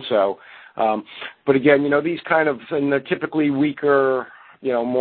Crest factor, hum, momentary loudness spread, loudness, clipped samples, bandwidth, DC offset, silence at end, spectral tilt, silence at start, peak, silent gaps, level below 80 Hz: 18 dB; none; 12 LU; -20 LUFS; under 0.1%; 4.5 kHz; under 0.1%; 0 s; -11 dB/octave; 0 s; -2 dBFS; none; -64 dBFS